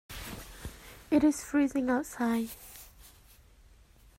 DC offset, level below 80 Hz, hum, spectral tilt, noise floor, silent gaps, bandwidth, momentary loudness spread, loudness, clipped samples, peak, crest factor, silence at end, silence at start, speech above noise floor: under 0.1%; -54 dBFS; none; -4.5 dB/octave; -58 dBFS; none; 16 kHz; 22 LU; -30 LUFS; under 0.1%; -14 dBFS; 18 dB; 1.1 s; 0.1 s; 30 dB